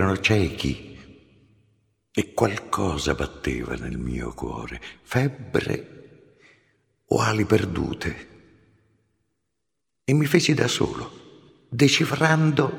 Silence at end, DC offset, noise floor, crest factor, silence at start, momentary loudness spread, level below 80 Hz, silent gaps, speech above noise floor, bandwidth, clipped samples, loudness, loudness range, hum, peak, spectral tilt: 0 s; under 0.1%; -82 dBFS; 22 dB; 0 s; 15 LU; -44 dBFS; none; 59 dB; 18.5 kHz; under 0.1%; -24 LUFS; 6 LU; none; -2 dBFS; -5 dB/octave